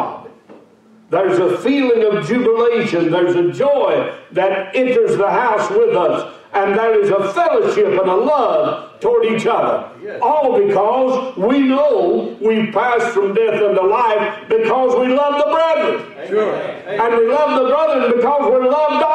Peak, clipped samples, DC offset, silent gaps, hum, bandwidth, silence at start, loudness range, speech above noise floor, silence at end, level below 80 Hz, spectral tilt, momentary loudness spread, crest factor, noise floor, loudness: -6 dBFS; under 0.1%; under 0.1%; none; none; 9.4 kHz; 0 s; 1 LU; 33 dB; 0 s; -60 dBFS; -6 dB/octave; 5 LU; 10 dB; -47 dBFS; -15 LUFS